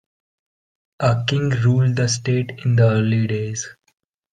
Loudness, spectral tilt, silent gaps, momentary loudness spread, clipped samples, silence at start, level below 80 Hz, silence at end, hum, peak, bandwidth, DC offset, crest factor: -19 LUFS; -5.5 dB/octave; none; 8 LU; under 0.1%; 1 s; -52 dBFS; 0.6 s; none; -4 dBFS; 9.4 kHz; under 0.1%; 16 dB